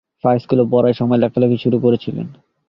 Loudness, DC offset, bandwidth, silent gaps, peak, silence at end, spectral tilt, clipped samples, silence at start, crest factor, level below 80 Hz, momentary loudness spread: -16 LUFS; under 0.1%; 5.6 kHz; none; -2 dBFS; 0.35 s; -10.5 dB/octave; under 0.1%; 0.25 s; 14 dB; -54 dBFS; 10 LU